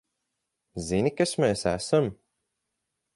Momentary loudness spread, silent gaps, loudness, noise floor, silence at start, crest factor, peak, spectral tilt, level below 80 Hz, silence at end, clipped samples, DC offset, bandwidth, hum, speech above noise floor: 10 LU; none; -26 LUFS; -82 dBFS; 0.75 s; 20 dB; -10 dBFS; -5 dB/octave; -54 dBFS; 1 s; under 0.1%; under 0.1%; 11.5 kHz; none; 57 dB